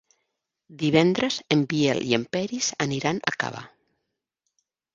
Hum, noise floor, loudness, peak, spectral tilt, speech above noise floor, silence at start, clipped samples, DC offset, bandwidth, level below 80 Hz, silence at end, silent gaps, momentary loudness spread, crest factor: none; -81 dBFS; -24 LUFS; -2 dBFS; -4.5 dB/octave; 57 dB; 0.7 s; under 0.1%; under 0.1%; 7.8 kHz; -64 dBFS; 1.3 s; none; 8 LU; 24 dB